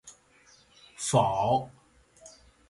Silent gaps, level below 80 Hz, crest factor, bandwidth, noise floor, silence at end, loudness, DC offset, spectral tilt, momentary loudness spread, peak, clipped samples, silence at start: none; -60 dBFS; 20 dB; 11.5 kHz; -60 dBFS; 0.4 s; -27 LUFS; under 0.1%; -5 dB/octave; 11 LU; -10 dBFS; under 0.1%; 0.05 s